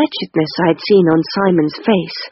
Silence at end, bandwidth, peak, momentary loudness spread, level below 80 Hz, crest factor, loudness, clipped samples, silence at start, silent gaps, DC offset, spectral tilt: 0 s; 6 kHz; -2 dBFS; 6 LU; -54 dBFS; 14 dB; -15 LUFS; under 0.1%; 0 s; none; under 0.1%; -5 dB/octave